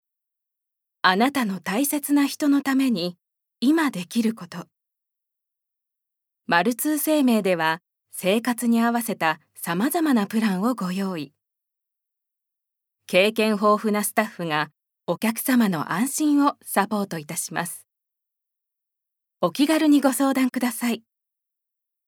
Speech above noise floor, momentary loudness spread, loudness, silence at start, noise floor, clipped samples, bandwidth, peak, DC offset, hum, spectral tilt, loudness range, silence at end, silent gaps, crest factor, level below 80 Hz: 63 dB; 10 LU; -22 LUFS; 1.05 s; -84 dBFS; under 0.1%; 19.5 kHz; -2 dBFS; under 0.1%; none; -4 dB/octave; 5 LU; 1.1 s; none; 22 dB; -80 dBFS